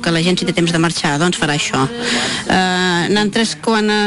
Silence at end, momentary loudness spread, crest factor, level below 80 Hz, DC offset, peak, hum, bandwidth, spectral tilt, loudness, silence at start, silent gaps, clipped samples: 0 s; 2 LU; 10 dB; -46 dBFS; under 0.1%; -4 dBFS; none; 11.5 kHz; -4 dB/octave; -15 LUFS; 0 s; none; under 0.1%